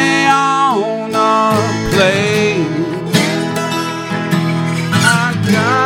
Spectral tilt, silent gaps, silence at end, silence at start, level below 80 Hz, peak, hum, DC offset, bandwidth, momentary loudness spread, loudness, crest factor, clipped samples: -5 dB/octave; none; 0 s; 0 s; -42 dBFS; 0 dBFS; none; under 0.1%; 16.5 kHz; 6 LU; -14 LUFS; 14 dB; under 0.1%